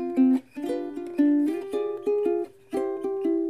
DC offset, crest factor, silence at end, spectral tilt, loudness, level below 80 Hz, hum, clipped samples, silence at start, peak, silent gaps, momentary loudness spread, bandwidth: 0.1%; 14 dB; 0 s; -6.5 dB/octave; -26 LUFS; -70 dBFS; none; under 0.1%; 0 s; -12 dBFS; none; 10 LU; 12 kHz